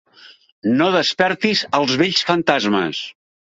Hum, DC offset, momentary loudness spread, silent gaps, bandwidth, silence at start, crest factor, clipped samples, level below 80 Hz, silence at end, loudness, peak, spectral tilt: none; under 0.1%; 9 LU; 0.52-0.62 s; 7.8 kHz; 0.25 s; 18 dB; under 0.1%; -60 dBFS; 0.4 s; -17 LUFS; -2 dBFS; -4.5 dB/octave